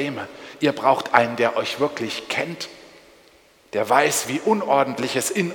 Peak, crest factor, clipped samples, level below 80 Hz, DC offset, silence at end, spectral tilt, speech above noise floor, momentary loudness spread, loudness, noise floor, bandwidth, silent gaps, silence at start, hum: 0 dBFS; 22 dB; under 0.1%; -66 dBFS; under 0.1%; 0 s; -3.5 dB/octave; 33 dB; 12 LU; -21 LUFS; -54 dBFS; 19 kHz; none; 0 s; none